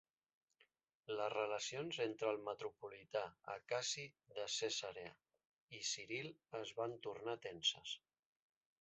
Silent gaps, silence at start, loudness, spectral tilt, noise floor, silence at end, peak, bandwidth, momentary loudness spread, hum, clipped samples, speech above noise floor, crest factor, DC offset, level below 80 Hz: 5.45-5.67 s; 1.1 s; -44 LUFS; -1.5 dB/octave; -79 dBFS; 0.85 s; -26 dBFS; 8 kHz; 11 LU; none; under 0.1%; 33 dB; 20 dB; under 0.1%; -86 dBFS